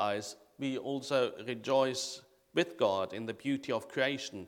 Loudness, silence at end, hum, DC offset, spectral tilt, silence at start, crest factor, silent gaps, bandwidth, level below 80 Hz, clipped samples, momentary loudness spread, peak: -34 LUFS; 0 s; none; under 0.1%; -4 dB/octave; 0 s; 20 dB; none; 16.5 kHz; -80 dBFS; under 0.1%; 9 LU; -14 dBFS